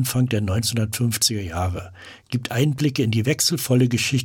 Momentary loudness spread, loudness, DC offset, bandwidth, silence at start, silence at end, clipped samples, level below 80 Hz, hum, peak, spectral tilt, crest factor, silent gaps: 9 LU; -21 LUFS; under 0.1%; 19 kHz; 0 s; 0 s; under 0.1%; -48 dBFS; none; -6 dBFS; -4.5 dB/octave; 16 dB; none